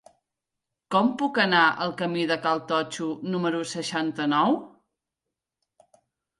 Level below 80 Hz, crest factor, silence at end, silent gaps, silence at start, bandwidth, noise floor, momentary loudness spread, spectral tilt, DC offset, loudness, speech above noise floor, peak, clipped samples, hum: -72 dBFS; 20 dB; 1.7 s; none; 0.9 s; 11.5 kHz; -86 dBFS; 9 LU; -4.5 dB/octave; under 0.1%; -25 LUFS; 62 dB; -8 dBFS; under 0.1%; none